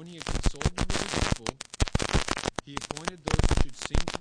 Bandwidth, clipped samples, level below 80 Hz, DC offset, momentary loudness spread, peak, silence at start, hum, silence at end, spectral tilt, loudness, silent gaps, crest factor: 10.5 kHz; under 0.1%; -32 dBFS; under 0.1%; 8 LU; -6 dBFS; 0 s; none; 0 s; -4 dB/octave; -30 LUFS; none; 22 dB